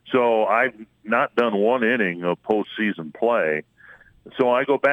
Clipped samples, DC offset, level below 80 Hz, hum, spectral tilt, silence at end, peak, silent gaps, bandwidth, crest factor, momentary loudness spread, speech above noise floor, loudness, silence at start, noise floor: under 0.1%; under 0.1%; -66 dBFS; none; -7 dB/octave; 0 s; -6 dBFS; none; 10.5 kHz; 16 dB; 7 LU; 29 dB; -21 LUFS; 0.05 s; -50 dBFS